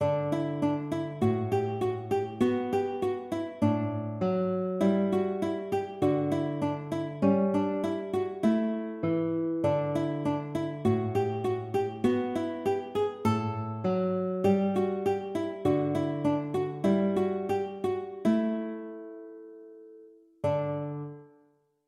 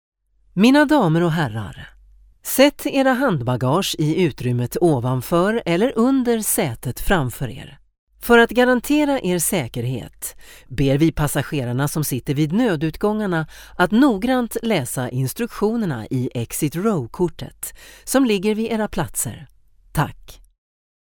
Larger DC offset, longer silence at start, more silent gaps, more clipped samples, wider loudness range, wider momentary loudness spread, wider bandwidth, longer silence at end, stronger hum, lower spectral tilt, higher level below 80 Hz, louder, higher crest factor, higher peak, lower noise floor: neither; second, 0 s vs 0.55 s; second, none vs 7.98-8.07 s; neither; about the same, 3 LU vs 4 LU; second, 7 LU vs 13 LU; second, 14 kHz vs over 20 kHz; second, 0.6 s vs 0.8 s; neither; first, -8.5 dB/octave vs -5 dB/octave; second, -66 dBFS vs -40 dBFS; second, -29 LUFS vs -19 LUFS; about the same, 16 dB vs 20 dB; second, -12 dBFS vs 0 dBFS; first, -66 dBFS vs -49 dBFS